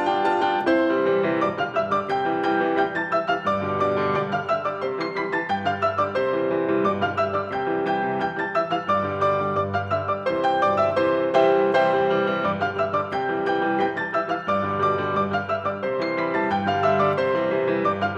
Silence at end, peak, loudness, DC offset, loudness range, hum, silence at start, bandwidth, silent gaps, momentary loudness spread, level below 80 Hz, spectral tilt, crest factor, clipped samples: 0 s; -6 dBFS; -23 LUFS; under 0.1%; 3 LU; none; 0 s; 8 kHz; none; 5 LU; -64 dBFS; -7 dB/octave; 18 dB; under 0.1%